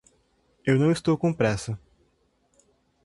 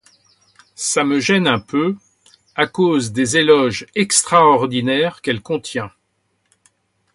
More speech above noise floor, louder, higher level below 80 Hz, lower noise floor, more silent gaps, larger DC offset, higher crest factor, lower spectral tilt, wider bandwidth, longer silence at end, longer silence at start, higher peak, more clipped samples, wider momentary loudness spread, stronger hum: second, 45 dB vs 51 dB; second, -25 LUFS vs -16 LUFS; about the same, -54 dBFS vs -56 dBFS; about the same, -68 dBFS vs -67 dBFS; neither; neither; about the same, 20 dB vs 18 dB; first, -6.5 dB/octave vs -3.5 dB/octave; about the same, 11.5 kHz vs 11.5 kHz; about the same, 1.3 s vs 1.25 s; second, 0.65 s vs 0.8 s; second, -8 dBFS vs 0 dBFS; neither; about the same, 12 LU vs 12 LU; neither